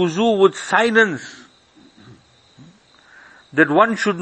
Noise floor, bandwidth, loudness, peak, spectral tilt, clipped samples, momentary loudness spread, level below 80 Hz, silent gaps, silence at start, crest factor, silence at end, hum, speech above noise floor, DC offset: -51 dBFS; 8.8 kHz; -16 LUFS; 0 dBFS; -5 dB/octave; under 0.1%; 11 LU; -64 dBFS; none; 0 s; 20 dB; 0 s; none; 35 dB; under 0.1%